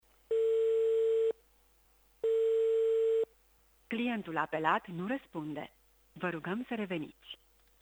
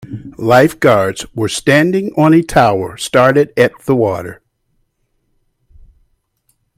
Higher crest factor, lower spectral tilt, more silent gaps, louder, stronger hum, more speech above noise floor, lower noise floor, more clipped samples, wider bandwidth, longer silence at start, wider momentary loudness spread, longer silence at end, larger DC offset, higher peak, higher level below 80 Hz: about the same, 18 dB vs 14 dB; about the same, -6.5 dB/octave vs -5.5 dB/octave; neither; second, -33 LUFS vs -12 LUFS; neither; second, 31 dB vs 52 dB; about the same, -67 dBFS vs -64 dBFS; neither; first, over 20 kHz vs 16 kHz; first, 0.3 s vs 0.1 s; first, 14 LU vs 10 LU; second, 0.45 s vs 2.45 s; neither; second, -16 dBFS vs 0 dBFS; second, -72 dBFS vs -44 dBFS